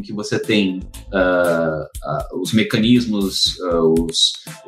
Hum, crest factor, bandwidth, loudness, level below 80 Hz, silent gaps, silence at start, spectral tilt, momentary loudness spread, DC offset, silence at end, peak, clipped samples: none; 16 dB; 15.5 kHz; -18 LUFS; -38 dBFS; none; 0 s; -4.5 dB/octave; 9 LU; under 0.1%; 0.05 s; -2 dBFS; under 0.1%